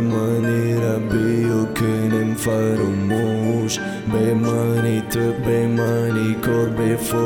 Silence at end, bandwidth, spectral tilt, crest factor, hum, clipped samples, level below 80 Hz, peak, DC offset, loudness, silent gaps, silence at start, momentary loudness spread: 0 s; 19 kHz; -6.5 dB/octave; 12 dB; none; under 0.1%; -46 dBFS; -6 dBFS; under 0.1%; -20 LUFS; none; 0 s; 2 LU